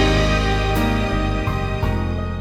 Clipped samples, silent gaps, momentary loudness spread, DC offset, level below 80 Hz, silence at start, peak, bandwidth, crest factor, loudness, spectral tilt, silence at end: under 0.1%; none; 5 LU; under 0.1%; -24 dBFS; 0 s; -6 dBFS; 17.5 kHz; 14 dB; -20 LUFS; -6 dB/octave; 0 s